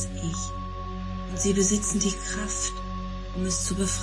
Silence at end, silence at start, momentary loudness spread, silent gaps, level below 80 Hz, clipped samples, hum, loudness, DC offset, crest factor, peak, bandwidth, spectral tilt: 0 s; 0 s; 12 LU; none; -36 dBFS; under 0.1%; none; -28 LUFS; under 0.1%; 16 dB; -12 dBFS; 11.5 kHz; -4 dB/octave